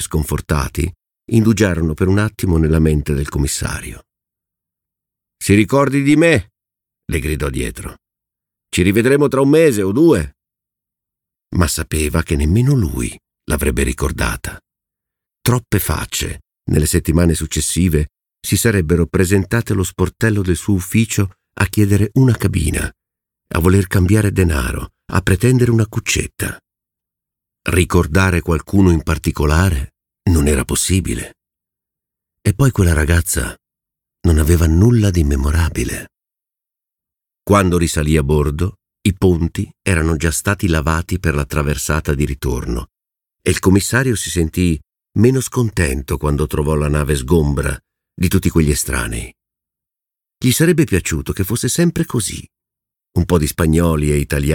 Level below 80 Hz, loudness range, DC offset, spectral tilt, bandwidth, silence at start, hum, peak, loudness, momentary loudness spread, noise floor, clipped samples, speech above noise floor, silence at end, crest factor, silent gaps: -26 dBFS; 3 LU; under 0.1%; -5.5 dB/octave; 18.5 kHz; 0 s; none; 0 dBFS; -16 LUFS; 11 LU; -86 dBFS; under 0.1%; 71 dB; 0 s; 16 dB; none